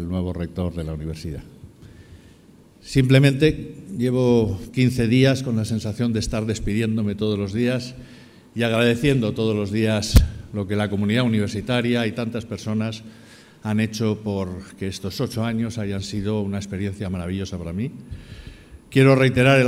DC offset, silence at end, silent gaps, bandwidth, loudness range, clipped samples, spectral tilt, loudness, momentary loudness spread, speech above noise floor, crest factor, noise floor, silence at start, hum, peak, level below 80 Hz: under 0.1%; 0 s; none; 16 kHz; 7 LU; under 0.1%; -6.5 dB/octave; -22 LUFS; 14 LU; 29 dB; 22 dB; -50 dBFS; 0 s; none; 0 dBFS; -34 dBFS